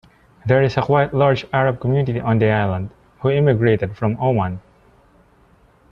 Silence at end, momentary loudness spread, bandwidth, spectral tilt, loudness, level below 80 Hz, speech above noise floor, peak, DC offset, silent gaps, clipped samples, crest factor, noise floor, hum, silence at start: 1.3 s; 9 LU; 6.8 kHz; -9 dB/octave; -18 LUFS; -48 dBFS; 36 dB; -2 dBFS; under 0.1%; none; under 0.1%; 16 dB; -53 dBFS; none; 0.45 s